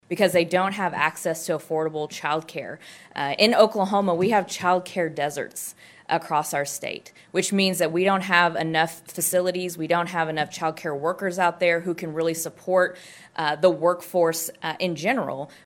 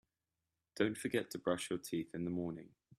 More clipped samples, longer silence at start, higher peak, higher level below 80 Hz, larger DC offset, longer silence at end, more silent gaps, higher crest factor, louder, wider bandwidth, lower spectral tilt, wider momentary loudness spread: neither; second, 0.1 s vs 0.75 s; first, -2 dBFS vs -18 dBFS; about the same, -74 dBFS vs -74 dBFS; neither; about the same, 0.2 s vs 0.3 s; neither; about the same, 22 dB vs 22 dB; first, -23 LUFS vs -40 LUFS; first, 17 kHz vs 14.5 kHz; about the same, -4 dB/octave vs -5 dB/octave; first, 11 LU vs 8 LU